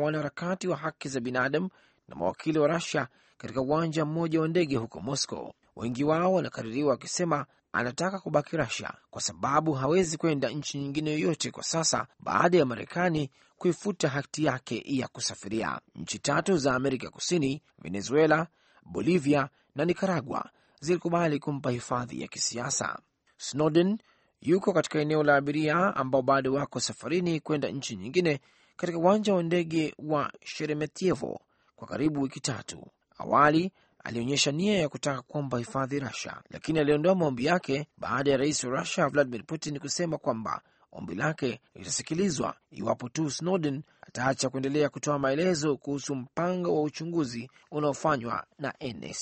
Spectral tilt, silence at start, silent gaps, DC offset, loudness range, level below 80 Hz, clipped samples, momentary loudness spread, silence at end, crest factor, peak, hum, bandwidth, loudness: -5 dB/octave; 0 s; none; under 0.1%; 4 LU; -62 dBFS; under 0.1%; 11 LU; 0 s; 20 dB; -8 dBFS; none; 8.8 kHz; -29 LUFS